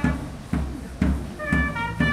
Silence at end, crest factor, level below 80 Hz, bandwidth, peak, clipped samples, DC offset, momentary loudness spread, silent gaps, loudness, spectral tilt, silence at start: 0 s; 18 dB; -30 dBFS; 13.5 kHz; -8 dBFS; under 0.1%; under 0.1%; 7 LU; none; -26 LUFS; -6.5 dB/octave; 0 s